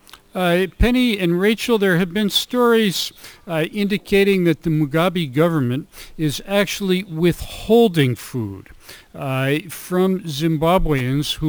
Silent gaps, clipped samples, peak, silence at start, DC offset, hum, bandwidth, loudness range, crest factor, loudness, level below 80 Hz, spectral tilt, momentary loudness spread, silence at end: none; under 0.1%; -4 dBFS; 0.35 s; under 0.1%; none; over 20 kHz; 3 LU; 16 dB; -19 LUFS; -34 dBFS; -5.5 dB/octave; 11 LU; 0 s